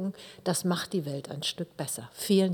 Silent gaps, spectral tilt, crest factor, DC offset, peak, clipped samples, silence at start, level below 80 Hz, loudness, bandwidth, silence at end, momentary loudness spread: none; -4.5 dB/octave; 18 dB; under 0.1%; -12 dBFS; under 0.1%; 0 s; -72 dBFS; -31 LUFS; 19 kHz; 0 s; 9 LU